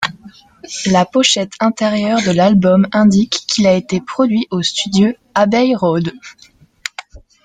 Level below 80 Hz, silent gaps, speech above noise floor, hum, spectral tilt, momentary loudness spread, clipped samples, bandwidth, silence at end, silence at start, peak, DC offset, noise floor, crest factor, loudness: -50 dBFS; none; 27 dB; none; -5 dB/octave; 13 LU; under 0.1%; 9.4 kHz; 0.25 s; 0 s; 0 dBFS; under 0.1%; -41 dBFS; 14 dB; -14 LUFS